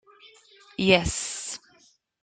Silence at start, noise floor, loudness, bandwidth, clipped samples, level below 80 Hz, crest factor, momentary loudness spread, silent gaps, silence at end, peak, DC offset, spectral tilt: 0.25 s; -62 dBFS; -24 LUFS; 9.6 kHz; under 0.1%; -46 dBFS; 24 dB; 19 LU; none; 0.65 s; -4 dBFS; under 0.1%; -3.5 dB/octave